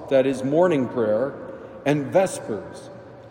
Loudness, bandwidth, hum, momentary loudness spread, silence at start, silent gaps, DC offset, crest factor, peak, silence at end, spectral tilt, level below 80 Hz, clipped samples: -22 LUFS; 16 kHz; none; 19 LU; 0 s; none; under 0.1%; 16 dB; -6 dBFS; 0 s; -6.5 dB/octave; -62 dBFS; under 0.1%